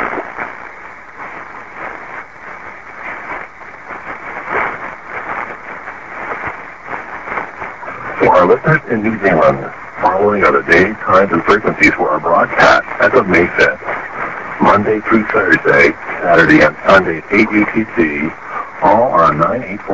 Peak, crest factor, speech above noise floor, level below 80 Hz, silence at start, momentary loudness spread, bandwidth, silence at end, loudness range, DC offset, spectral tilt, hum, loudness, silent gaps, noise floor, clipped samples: 0 dBFS; 14 dB; 21 dB; -42 dBFS; 0 s; 18 LU; 8 kHz; 0 s; 13 LU; 0.8%; -6.5 dB/octave; none; -12 LUFS; none; -33 dBFS; under 0.1%